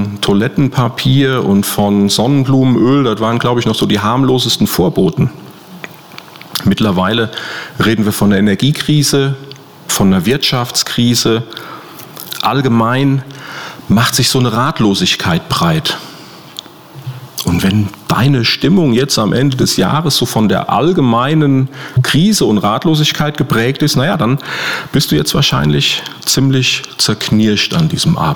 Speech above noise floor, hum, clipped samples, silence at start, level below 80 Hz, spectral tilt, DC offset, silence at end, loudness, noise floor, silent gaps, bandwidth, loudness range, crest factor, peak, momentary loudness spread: 22 dB; none; under 0.1%; 0 s; -40 dBFS; -5 dB/octave; under 0.1%; 0 s; -12 LUFS; -34 dBFS; none; over 20 kHz; 3 LU; 10 dB; -2 dBFS; 15 LU